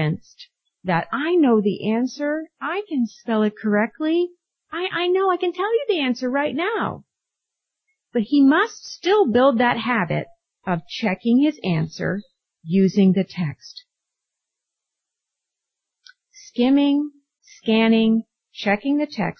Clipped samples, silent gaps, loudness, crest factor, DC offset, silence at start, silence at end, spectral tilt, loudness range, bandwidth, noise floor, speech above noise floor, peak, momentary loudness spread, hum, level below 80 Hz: under 0.1%; none; -21 LUFS; 16 dB; under 0.1%; 0 s; 0.05 s; -6.5 dB/octave; 5 LU; 6.6 kHz; -83 dBFS; 63 dB; -6 dBFS; 12 LU; none; -62 dBFS